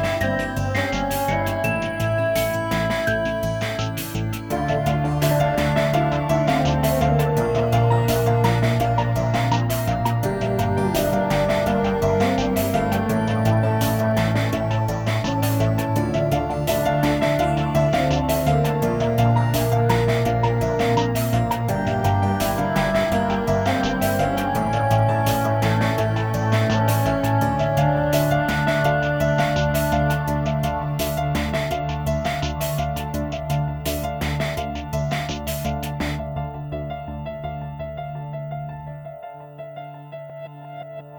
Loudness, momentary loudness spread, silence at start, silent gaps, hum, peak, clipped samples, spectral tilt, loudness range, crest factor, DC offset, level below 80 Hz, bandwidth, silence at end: -21 LUFS; 11 LU; 0 s; none; none; -4 dBFS; under 0.1%; -6 dB/octave; 7 LU; 16 dB; under 0.1%; -36 dBFS; over 20 kHz; 0 s